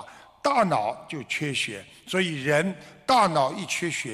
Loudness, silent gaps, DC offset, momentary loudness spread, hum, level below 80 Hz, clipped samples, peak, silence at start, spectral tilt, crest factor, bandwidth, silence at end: -25 LUFS; none; under 0.1%; 10 LU; none; -64 dBFS; under 0.1%; -6 dBFS; 0 s; -4 dB/octave; 18 dB; 15 kHz; 0 s